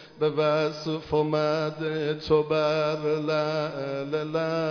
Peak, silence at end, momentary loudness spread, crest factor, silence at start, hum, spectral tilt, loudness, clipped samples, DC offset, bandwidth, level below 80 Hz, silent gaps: -12 dBFS; 0 s; 6 LU; 14 dB; 0 s; none; -6.5 dB/octave; -26 LUFS; under 0.1%; under 0.1%; 5.4 kHz; -58 dBFS; none